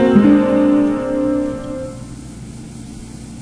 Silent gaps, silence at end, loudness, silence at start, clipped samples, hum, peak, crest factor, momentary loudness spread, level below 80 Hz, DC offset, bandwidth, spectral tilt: none; 0 s; -15 LUFS; 0 s; under 0.1%; none; 0 dBFS; 16 dB; 21 LU; -40 dBFS; under 0.1%; 10.5 kHz; -7.5 dB/octave